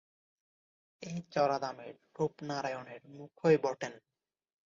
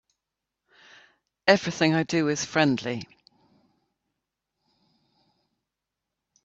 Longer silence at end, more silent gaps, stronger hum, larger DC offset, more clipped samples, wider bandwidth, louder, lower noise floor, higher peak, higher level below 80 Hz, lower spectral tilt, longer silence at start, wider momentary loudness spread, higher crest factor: second, 0.7 s vs 3.4 s; neither; neither; neither; neither; about the same, 7.6 kHz vs 8 kHz; second, -34 LUFS vs -24 LUFS; first, under -90 dBFS vs -86 dBFS; second, -14 dBFS vs -4 dBFS; second, -78 dBFS vs -68 dBFS; about the same, -5 dB/octave vs -4.5 dB/octave; second, 1 s vs 1.45 s; first, 21 LU vs 12 LU; about the same, 22 dB vs 26 dB